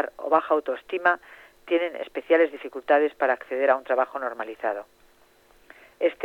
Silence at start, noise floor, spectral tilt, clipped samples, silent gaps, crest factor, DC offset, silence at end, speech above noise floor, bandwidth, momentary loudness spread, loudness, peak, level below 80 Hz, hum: 0 s; -58 dBFS; -4.5 dB/octave; under 0.1%; none; 20 dB; under 0.1%; 0 s; 33 dB; 6.4 kHz; 9 LU; -25 LUFS; -6 dBFS; -68 dBFS; none